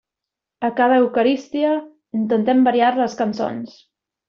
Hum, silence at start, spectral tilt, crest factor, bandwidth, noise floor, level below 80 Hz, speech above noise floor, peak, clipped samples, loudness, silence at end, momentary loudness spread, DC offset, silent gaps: none; 0.6 s; -4 dB/octave; 14 dB; 7 kHz; -85 dBFS; -66 dBFS; 67 dB; -4 dBFS; under 0.1%; -19 LUFS; 0.6 s; 10 LU; under 0.1%; none